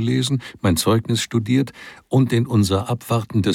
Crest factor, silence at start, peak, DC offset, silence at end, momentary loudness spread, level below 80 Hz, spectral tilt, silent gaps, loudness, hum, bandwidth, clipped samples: 14 dB; 0 s; -6 dBFS; under 0.1%; 0 s; 5 LU; -48 dBFS; -5.5 dB/octave; none; -20 LUFS; none; 16.5 kHz; under 0.1%